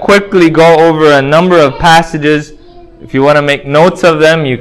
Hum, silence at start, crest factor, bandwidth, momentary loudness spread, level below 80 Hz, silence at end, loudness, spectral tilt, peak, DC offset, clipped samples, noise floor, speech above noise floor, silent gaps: none; 0 s; 8 dB; 16 kHz; 6 LU; -36 dBFS; 0 s; -7 LUFS; -5.5 dB/octave; 0 dBFS; under 0.1%; 3%; -32 dBFS; 26 dB; none